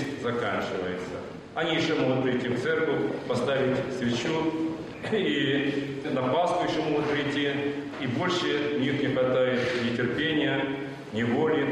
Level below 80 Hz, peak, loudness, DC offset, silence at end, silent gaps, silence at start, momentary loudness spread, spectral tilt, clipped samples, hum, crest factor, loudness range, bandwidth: -62 dBFS; -14 dBFS; -27 LUFS; under 0.1%; 0 s; none; 0 s; 7 LU; -6 dB/octave; under 0.1%; none; 14 dB; 1 LU; 11 kHz